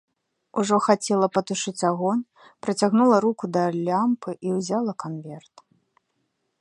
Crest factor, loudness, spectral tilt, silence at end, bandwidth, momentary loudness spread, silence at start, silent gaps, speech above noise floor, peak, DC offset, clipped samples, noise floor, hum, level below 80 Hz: 22 dB; -23 LUFS; -5.5 dB/octave; 1.2 s; 11.5 kHz; 14 LU; 0.55 s; none; 51 dB; -2 dBFS; under 0.1%; under 0.1%; -74 dBFS; none; -72 dBFS